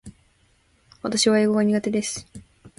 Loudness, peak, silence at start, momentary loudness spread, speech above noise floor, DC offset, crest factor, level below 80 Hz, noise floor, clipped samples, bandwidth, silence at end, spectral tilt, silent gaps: -22 LUFS; -6 dBFS; 0.05 s; 14 LU; 40 dB; under 0.1%; 18 dB; -58 dBFS; -62 dBFS; under 0.1%; 11.5 kHz; 0.1 s; -4 dB/octave; none